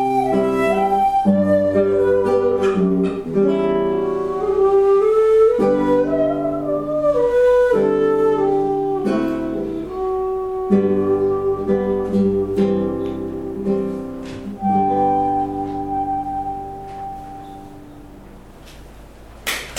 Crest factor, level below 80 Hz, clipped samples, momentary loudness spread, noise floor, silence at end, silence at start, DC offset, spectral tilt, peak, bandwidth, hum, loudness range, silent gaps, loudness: 16 dB; -44 dBFS; under 0.1%; 12 LU; -40 dBFS; 0 s; 0 s; under 0.1%; -7 dB/octave; -2 dBFS; 15 kHz; none; 8 LU; none; -18 LUFS